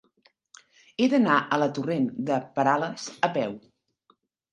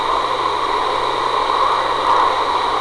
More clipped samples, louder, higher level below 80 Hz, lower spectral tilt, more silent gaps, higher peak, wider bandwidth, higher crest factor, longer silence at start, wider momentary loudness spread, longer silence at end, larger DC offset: neither; second, -25 LUFS vs -17 LUFS; second, -74 dBFS vs -44 dBFS; first, -5.5 dB/octave vs -3 dB/octave; neither; about the same, -4 dBFS vs -6 dBFS; second, 9.2 kHz vs 11 kHz; first, 22 dB vs 10 dB; first, 1 s vs 0 s; first, 11 LU vs 3 LU; first, 0.95 s vs 0 s; neither